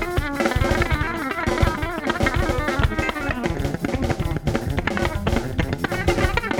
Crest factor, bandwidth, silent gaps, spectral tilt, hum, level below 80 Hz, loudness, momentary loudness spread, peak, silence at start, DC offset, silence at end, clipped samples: 18 dB; 19 kHz; none; -6 dB/octave; none; -28 dBFS; -23 LUFS; 4 LU; -4 dBFS; 0 s; under 0.1%; 0 s; under 0.1%